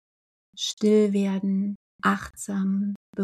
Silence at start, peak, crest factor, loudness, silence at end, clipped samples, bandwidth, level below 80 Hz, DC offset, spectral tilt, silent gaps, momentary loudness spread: 0.55 s; -8 dBFS; 18 dB; -25 LUFS; 0 s; under 0.1%; 13.5 kHz; -60 dBFS; under 0.1%; -5.5 dB/octave; 0.73-0.77 s, 1.75-1.99 s, 2.96-3.13 s; 10 LU